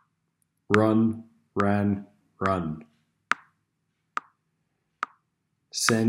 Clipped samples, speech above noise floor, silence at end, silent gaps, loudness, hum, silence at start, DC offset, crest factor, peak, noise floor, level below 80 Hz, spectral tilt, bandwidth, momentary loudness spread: under 0.1%; 53 dB; 0 s; none; -27 LUFS; none; 0.7 s; under 0.1%; 26 dB; -2 dBFS; -77 dBFS; -64 dBFS; -5 dB/octave; 16 kHz; 14 LU